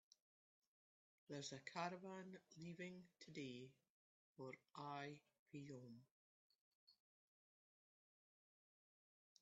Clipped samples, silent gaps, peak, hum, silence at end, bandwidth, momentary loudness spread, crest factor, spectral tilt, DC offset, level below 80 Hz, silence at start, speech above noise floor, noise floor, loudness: under 0.1%; 3.89-4.35 s, 5.39-5.46 s, 6.11-6.87 s; -32 dBFS; none; 2.45 s; 8 kHz; 12 LU; 28 dB; -4 dB/octave; under 0.1%; under -90 dBFS; 1.3 s; over 35 dB; under -90 dBFS; -56 LUFS